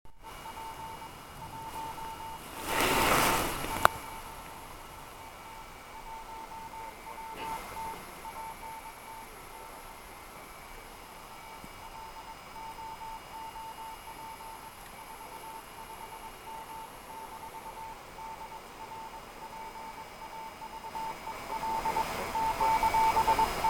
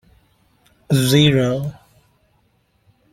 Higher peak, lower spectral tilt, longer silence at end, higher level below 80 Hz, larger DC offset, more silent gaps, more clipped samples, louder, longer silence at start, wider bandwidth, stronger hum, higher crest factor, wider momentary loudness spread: about the same, 0 dBFS vs -2 dBFS; second, -3 dB/octave vs -5.5 dB/octave; second, 0 s vs 1.4 s; about the same, -52 dBFS vs -52 dBFS; neither; neither; neither; second, -35 LUFS vs -17 LUFS; second, 0.05 s vs 0.9 s; about the same, 17.5 kHz vs 16 kHz; neither; first, 36 dB vs 20 dB; first, 19 LU vs 12 LU